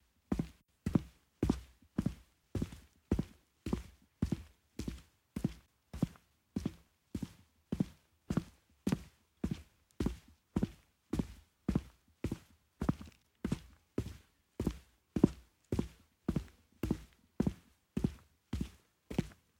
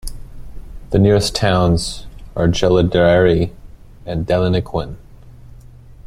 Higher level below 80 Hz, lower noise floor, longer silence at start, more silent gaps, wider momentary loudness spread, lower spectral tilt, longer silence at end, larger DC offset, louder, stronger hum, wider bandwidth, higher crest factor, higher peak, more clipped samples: second, -50 dBFS vs -32 dBFS; first, -61 dBFS vs -39 dBFS; first, 0.3 s vs 0.05 s; neither; about the same, 17 LU vs 16 LU; first, -7.5 dB/octave vs -6 dB/octave; about the same, 0.25 s vs 0.15 s; neither; second, -41 LUFS vs -16 LUFS; neither; first, 16.5 kHz vs 13.5 kHz; first, 30 dB vs 16 dB; second, -10 dBFS vs -2 dBFS; neither